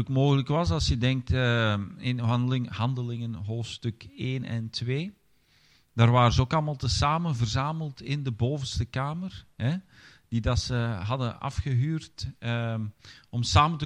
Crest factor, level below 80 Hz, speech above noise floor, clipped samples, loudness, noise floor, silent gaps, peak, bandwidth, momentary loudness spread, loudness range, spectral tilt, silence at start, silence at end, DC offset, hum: 22 dB; -44 dBFS; 36 dB; under 0.1%; -28 LUFS; -63 dBFS; none; -6 dBFS; 9.8 kHz; 12 LU; 5 LU; -6 dB/octave; 0 s; 0 s; under 0.1%; none